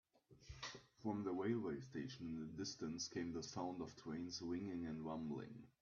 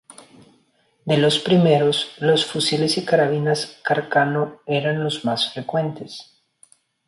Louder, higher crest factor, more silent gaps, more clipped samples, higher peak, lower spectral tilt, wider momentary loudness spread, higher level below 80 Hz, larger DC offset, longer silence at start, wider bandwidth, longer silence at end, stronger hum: second, -48 LUFS vs -20 LUFS; about the same, 18 dB vs 16 dB; neither; neither; second, -30 dBFS vs -4 dBFS; about the same, -5 dB/octave vs -5 dB/octave; about the same, 9 LU vs 8 LU; second, -72 dBFS vs -64 dBFS; neither; second, 0.3 s vs 1.05 s; second, 7 kHz vs 11.5 kHz; second, 0.1 s vs 0.85 s; neither